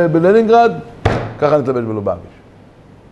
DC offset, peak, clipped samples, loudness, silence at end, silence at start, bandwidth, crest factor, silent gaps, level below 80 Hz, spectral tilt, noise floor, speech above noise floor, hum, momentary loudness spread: under 0.1%; 0 dBFS; under 0.1%; -14 LUFS; 0.85 s; 0 s; 9 kHz; 14 dB; none; -36 dBFS; -8 dB/octave; -42 dBFS; 29 dB; none; 11 LU